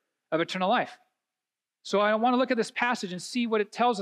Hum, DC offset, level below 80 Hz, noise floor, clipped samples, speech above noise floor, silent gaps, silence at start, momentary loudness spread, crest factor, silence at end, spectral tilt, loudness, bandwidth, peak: none; under 0.1%; -86 dBFS; under -90 dBFS; under 0.1%; over 63 dB; none; 0.3 s; 8 LU; 16 dB; 0 s; -4.5 dB/octave; -27 LUFS; 12.5 kHz; -12 dBFS